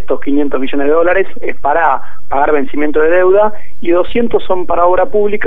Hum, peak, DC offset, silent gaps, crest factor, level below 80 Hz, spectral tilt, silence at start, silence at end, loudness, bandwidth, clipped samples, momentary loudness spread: none; 0 dBFS; 30%; none; 14 dB; -36 dBFS; -7.5 dB/octave; 0 s; 0 s; -13 LUFS; 4.1 kHz; under 0.1%; 6 LU